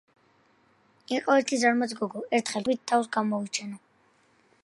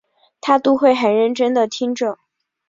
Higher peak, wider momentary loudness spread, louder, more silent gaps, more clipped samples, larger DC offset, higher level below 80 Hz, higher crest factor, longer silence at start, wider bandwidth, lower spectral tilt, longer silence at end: second, -8 dBFS vs -2 dBFS; about the same, 10 LU vs 10 LU; second, -27 LUFS vs -17 LUFS; neither; neither; neither; second, -76 dBFS vs -66 dBFS; first, 22 dB vs 16 dB; first, 1.1 s vs 0.45 s; first, 11.5 kHz vs 7.8 kHz; about the same, -3.5 dB/octave vs -4.5 dB/octave; first, 0.85 s vs 0.55 s